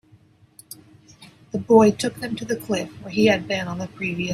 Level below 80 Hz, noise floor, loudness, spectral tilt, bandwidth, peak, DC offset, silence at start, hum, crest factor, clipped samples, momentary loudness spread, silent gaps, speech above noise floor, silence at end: -58 dBFS; -54 dBFS; -21 LUFS; -5.5 dB/octave; 15.5 kHz; -2 dBFS; under 0.1%; 1.2 s; none; 20 dB; under 0.1%; 25 LU; none; 33 dB; 0 s